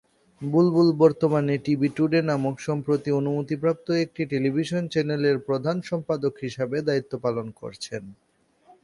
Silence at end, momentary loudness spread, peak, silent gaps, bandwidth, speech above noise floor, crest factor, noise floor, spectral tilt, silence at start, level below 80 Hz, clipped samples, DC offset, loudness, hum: 0.7 s; 11 LU; -6 dBFS; none; 11.5 kHz; 34 dB; 18 dB; -58 dBFS; -7.5 dB/octave; 0.4 s; -64 dBFS; under 0.1%; under 0.1%; -24 LUFS; none